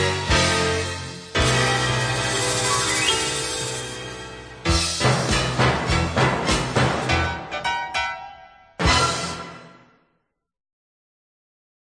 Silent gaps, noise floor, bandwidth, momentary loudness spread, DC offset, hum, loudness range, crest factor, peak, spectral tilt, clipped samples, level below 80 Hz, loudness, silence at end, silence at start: none; -72 dBFS; 10.5 kHz; 12 LU; under 0.1%; none; 6 LU; 18 dB; -4 dBFS; -3.5 dB/octave; under 0.1%; -36 dBFS; -21 LUFS; 2.25 s; 0 s